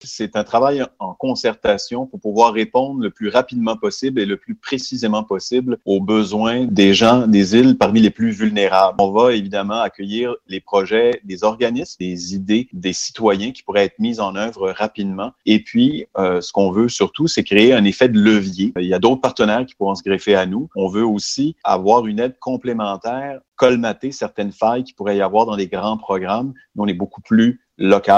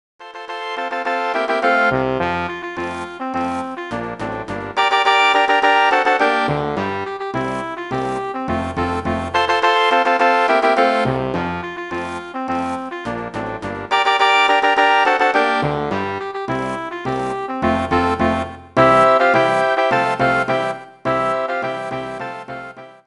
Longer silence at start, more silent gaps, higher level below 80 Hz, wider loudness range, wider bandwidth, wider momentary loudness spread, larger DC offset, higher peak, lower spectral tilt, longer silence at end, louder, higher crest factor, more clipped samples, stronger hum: second, 0.05 s vs 0.2 s; first, 23.48-23.52 s vs none; second, -54 dBFS vs -46 dBFS; about the same, 6 LU vs 5 LU; second, 8.2 kHz vs 11 kHz; about the same, 11 LU vs 13 LU; neither; about the same, 0 dBFS vs -2 dBFS; about the same, -5 dB/octave vs -5 dB/octave; second, 0 s vs 0.15 s; about the same, -17 LUFS vs -18 LUFS; about the same, 16 dB vs 16 dB; neither; neither